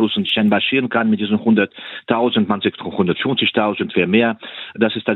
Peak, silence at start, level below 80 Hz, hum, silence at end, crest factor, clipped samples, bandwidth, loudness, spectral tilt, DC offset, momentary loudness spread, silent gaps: 0 dBFS; 0 s; -62 dBFS; none; 0 s; 18 dB; under 0.1%; 4.2 kHz; -17 LUFS; -8.5 dB/octave; under 0.1%; 6 LU; none